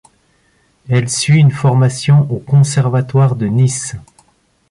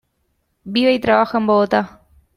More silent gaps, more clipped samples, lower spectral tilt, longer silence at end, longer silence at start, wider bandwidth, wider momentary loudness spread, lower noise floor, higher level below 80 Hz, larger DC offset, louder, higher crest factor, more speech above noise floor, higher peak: neither; neither; about the same, -6 dB/octave vs -6.5 dB/octave; first, 0.7 s vs 0.5 s; first, 0.9 s vs 0.65 s; second, 11.5 kHz vs 14.5 kHz; about the same, 7 LU vs 7 LU; second, -56 dBFS vs -68 dBFS; first, -48 dBFS vs -54 dBFS; neither; first, -13 LUFS vs -16 LUFS; about the same, 12 dB vs 16 dB; second, 44 dB vs 52 dB; about the same, -2 dBFS vs -2 dBFS